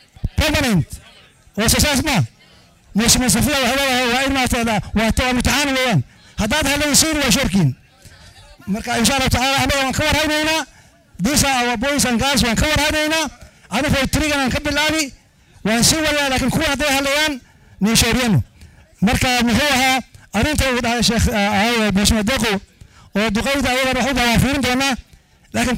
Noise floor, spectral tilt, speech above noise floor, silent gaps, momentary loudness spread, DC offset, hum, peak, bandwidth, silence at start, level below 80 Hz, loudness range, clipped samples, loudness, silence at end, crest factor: -49 dBFS; -3.5 dB/octave; 32 dB; none; 10 LU; under 0.1%; none; 0 dBFS; 16.5 kHz; 0.25 s; -32 dBFS; 2 LU; under 0.1%; -17 LUFS; 0 s; 18 dB